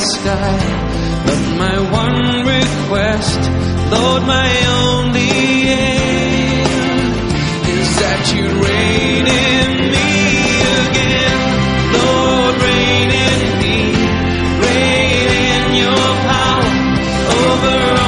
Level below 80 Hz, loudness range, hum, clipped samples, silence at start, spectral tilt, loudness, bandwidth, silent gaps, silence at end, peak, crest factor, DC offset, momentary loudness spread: -26 dBFS; 2 LU; none; under 0.1%; 0 s; -4.5 dB/octave; -13 LUFS; 11 kHz; none; 0 s; 0 dBFS; 12 dB; under 0.1%; 4 LU